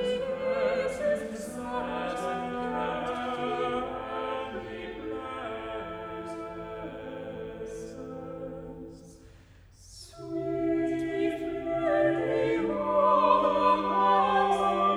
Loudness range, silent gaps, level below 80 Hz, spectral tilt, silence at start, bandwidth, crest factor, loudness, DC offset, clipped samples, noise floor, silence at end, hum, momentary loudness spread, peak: 15 LU; none; -56 dBFS; -5.5 dB/octave; 0 s; 13 kHz; 20 dB; -29 LUFS; under 0.1%; under 0.1%; -54 dBFS; 0 s; none; 16 LU; -8 dBFS